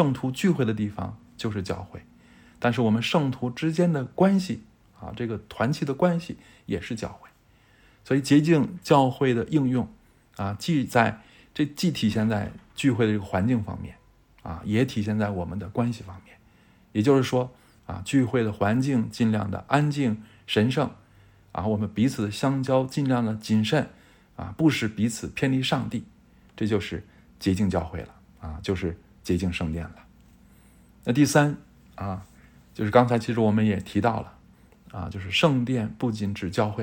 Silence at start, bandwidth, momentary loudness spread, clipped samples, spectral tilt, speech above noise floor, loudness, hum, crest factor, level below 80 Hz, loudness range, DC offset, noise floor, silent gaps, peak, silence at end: 0 s; 17.5 kHz; 16 LU; under 0.1%; -6.5 dB/octave; 34 dB; -25 LUFS; none; 22 dB; -52 dBFS; 5 LU; under 0.1%; -59 dBFS; none; -4 dBFS; 0 s